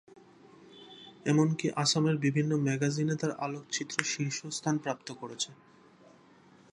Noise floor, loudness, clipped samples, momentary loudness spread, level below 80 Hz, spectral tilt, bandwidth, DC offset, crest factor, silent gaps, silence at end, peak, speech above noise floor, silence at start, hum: -59 dBFS; -31 LUFS; under 0.1%; 11 LU; -76 dBFS; -4.5 dB/octave; 11.5 kHz; under 0.1%; 26 dB; none; 1.2 s; -6 dBFS; 28 dB; 0.6 s; none